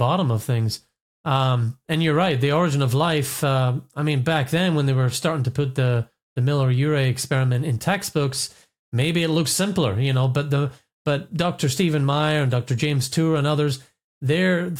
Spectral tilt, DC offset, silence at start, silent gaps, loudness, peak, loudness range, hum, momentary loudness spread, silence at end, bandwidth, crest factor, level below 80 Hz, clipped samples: -5.5 dB/octave; under 0.1%; 0 s; 1.01-1.24 s, 6.23-6.36 s, 8.79-8.92 s, 10.93-11.05 s, 14.04-14.21 s; -22 LUFS; -6 dBFS; 1 LU; none; 6 LU; 0 s; 16 kHz; 16 dB; -56 dBFS; under 0.1%